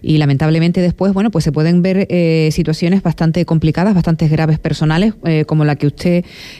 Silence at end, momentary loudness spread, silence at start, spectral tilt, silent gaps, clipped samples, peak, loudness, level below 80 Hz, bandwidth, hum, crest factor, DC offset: 0 s; 3 LU; 0 s; -7.5 dB/octave; none; under 0.1%; -4 dBFS; -14 LUFS; -36 dBFS; 11 kHz; none; 10 dB; under 0.1%